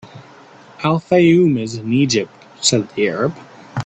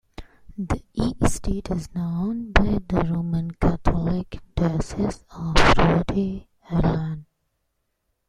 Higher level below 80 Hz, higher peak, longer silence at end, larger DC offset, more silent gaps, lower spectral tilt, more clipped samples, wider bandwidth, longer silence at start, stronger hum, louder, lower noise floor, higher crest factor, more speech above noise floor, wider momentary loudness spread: second, -54 dBFS vs -30 dBFS; about the same, 0 dBFS vs -2 dBFS; second, 0 s vs 1.05 s; neither; neither; about the same, -5 dB/octave vs -6 dB/octave; neither; second, 9.2 kHz vs 12.5 kHz; second, 0.05 s vs 0.2 s; neither; first, -16 LUFS vs -24 LUFS; second, -43 dBFS vs -74 dBFS; about the same, 16 dB vs 20 dB; second, 27 dB vs 53 dB; about the same, 11 LU vs 11 LU